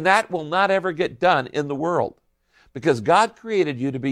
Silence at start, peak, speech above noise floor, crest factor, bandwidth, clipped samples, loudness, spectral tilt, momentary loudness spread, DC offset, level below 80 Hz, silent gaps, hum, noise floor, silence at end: 0 s; -4 dBFS; 40 dB; 18 dB; 13 kHz; under 0.1%; -21 LUFS; -5 dB/octave; 7 LU; under 0.1%; -62 dBFS; none; none; -60 dBFS; 0 s